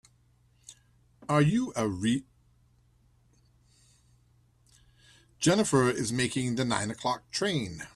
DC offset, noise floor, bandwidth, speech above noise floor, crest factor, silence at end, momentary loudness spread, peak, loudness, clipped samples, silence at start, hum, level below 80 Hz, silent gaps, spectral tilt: under 0.1%; -65 dBFS; 13 kHz; 37 dB; 20 dB; 0.1 s; 7 LU; -12 dBFS; -28 LUFS; under 0.1%; 0.7 s; none; -60 dBFS; none; -5 dB/octave